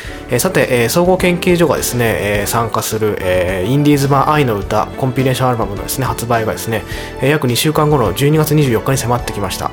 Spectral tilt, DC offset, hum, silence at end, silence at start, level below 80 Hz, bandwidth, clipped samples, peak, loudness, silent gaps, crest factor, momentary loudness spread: -5 dB/octave; under 0.1%; none; 0 s; 0 s; -34 dBFS; 19 kHz; under 0.1%; 0 dBFS; -14 LUFS; none; 14 dB; 6 LU